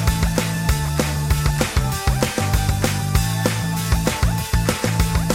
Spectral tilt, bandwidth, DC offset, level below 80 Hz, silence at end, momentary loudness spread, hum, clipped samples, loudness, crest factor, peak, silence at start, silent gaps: -5 dB/octave; 17 kHz; under 0.1%; -24 dBFS; 0 s; 2 LU; none; under 0.1%; -20 LUFS; 16 dB; -4 dBFS; 0 s; none